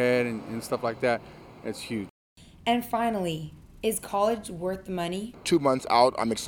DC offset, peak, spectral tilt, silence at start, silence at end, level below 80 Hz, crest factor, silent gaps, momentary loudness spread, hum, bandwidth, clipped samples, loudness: under 0.1%; -8 dBFS; -4.5 dB/octave; 0 s; 0 s; -56 dBFS; 20 dB; 2.10-2.36 s; 13 LU; none; 19.5 kHz; under 0.1%; -28 LUFS